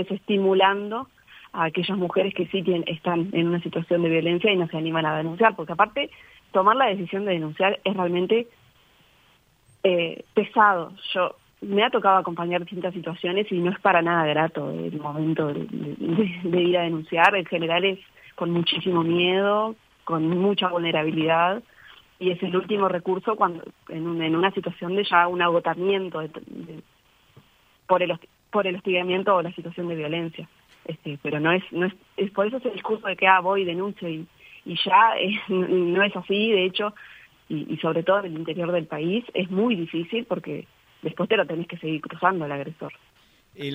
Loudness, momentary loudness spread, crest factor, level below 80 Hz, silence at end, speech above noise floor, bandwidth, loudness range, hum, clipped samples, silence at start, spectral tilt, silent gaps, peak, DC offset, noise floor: -23 LUFS; 13 LU; 22 dB; -68 dBFS; 0 s; 37 dB; 15 kHz; 4 LU; none; under 0.1%; 0 s; -7.5 dB/octave; none; -2 dBFS; under 0.1%; -60 dBFS